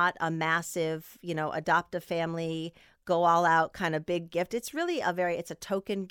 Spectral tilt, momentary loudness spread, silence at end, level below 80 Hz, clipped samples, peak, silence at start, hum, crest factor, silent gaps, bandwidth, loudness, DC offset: -5 dB/octave; 11 LU; 0 s; -66 dBFS; under 0.1%; -12 dBFS; 0 s; none; 18 dB; none; 19 kHz; -29 LUFS; under 0.1%